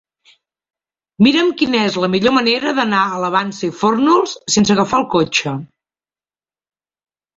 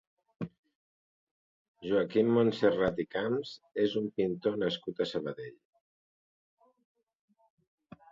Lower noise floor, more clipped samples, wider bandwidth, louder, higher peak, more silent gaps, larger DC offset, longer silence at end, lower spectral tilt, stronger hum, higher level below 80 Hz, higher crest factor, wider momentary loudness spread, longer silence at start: about the same, under -90 dBFS vs under -90 dBFS; neither; about the same, 8 kHz vs 7.6 kHz; first, -15 LUFS vs -31 LUFS; first, -2 dBFS vs -14 dBFS; second, none vs 0.58-0.63 s, 0.75-1.74 s; neither; second, 1.7 s vs 2.6 s; second, -4 dB/octave vs -7 dB/octave; neither; first, -54 dBFS vs -66 dBFS; about the same, 16 dB vs 20 dB; second, 5 LU vs 17 LU; first, 1.2 s vs 0.4 s